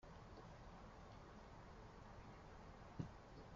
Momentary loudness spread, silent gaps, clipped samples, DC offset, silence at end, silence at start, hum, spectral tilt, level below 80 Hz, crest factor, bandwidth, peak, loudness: 6 LU; none; under 0.1%; under 0.1%; 0 s; 0 s; none; -6 dB/octave; -66 dBFS; 24 dB; 7.4 kHz; -34 dBFS; -59 LUFS